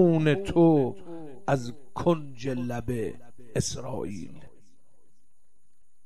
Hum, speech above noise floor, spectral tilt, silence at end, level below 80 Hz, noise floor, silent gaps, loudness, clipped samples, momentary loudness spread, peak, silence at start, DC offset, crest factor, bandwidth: none; 48 dB; -6.5 dB/octave; 0 s; -52 dBFS; -74 dBFS; none; -27 LUFS; under 0.1%; 17 LU; -10 dBFS; 0 s; 1%; 18 dB; 13 kHz